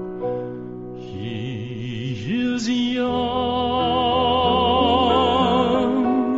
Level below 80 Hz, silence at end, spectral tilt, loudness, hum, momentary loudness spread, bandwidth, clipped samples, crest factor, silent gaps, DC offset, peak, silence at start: -42 dBFS; 0 s; -4 dB/octave; -20 LUFS; none; 13 LU; 7.8 kHz; under 0.1%; 16 dB; none; under 0.1%; -6 dBFS; 0 s